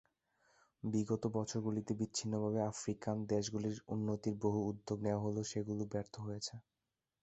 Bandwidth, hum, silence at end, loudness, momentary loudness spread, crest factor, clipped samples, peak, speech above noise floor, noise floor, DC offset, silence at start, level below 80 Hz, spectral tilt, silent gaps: 8.2 kHz; none; 0.6 s; -40 LUFS; 6 LU; 18 dB; under 0.1%; -22 dBFS; over 51 dB; under -90 dBFS; under 0.1%; 0.85 s; -68 dBFS; -6 dB/octave; none